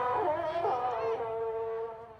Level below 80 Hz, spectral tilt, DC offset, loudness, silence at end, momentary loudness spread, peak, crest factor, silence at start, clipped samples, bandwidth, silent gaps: -64 dBFS; -6.5 dB/octave; under 0.1%; -33 LUFS; 0 s; 5 LU; -20 dBFS; 14 dB; 0 s; under 0.1%; 6.8 kHz; none